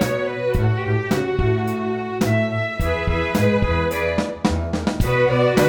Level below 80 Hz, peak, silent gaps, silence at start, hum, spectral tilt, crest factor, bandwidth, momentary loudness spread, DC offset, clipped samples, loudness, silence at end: -30 dBFS; -4 dBFS; none; 0 s; none; -6.5 dB/octave; 16 dB; 19 kHz; 5 LU; under 0.1%; under 0.1%; -21 LUFS; 0 s